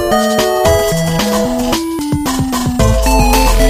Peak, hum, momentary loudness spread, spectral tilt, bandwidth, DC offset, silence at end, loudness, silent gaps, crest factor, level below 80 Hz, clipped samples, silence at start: 0 dBFS; none; 5 LU; -4.5 dB/octave; 16 kHz; under 0.1%; 0 s; -13 LUFS; none; 12 dB; -18 dBFS; under 0.1%; 0 s